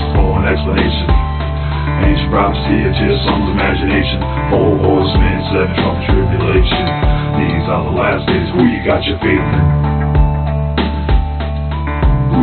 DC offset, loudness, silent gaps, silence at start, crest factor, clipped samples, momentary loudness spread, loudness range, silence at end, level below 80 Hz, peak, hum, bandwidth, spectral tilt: under 0.1%; -14 LUFS; none; 0 s; 12 dB; under 0.1%; 4 LU; 1 LU; 0 s; -18 dBFS; 0 dBFS; none; 4.5 kHz; -5.5 dB/octave